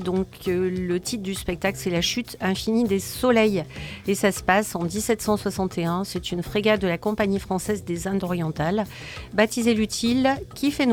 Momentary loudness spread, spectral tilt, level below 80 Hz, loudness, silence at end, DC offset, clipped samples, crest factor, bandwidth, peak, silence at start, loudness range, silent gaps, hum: 7 LU; -5 dB/octave; -46 dBFS; -24 LUFS; 0 s; under 0.1%; under 0.1%; 18 dB; 18.5 kHz; -6 dBFS; 0 s; 2 LU; none; none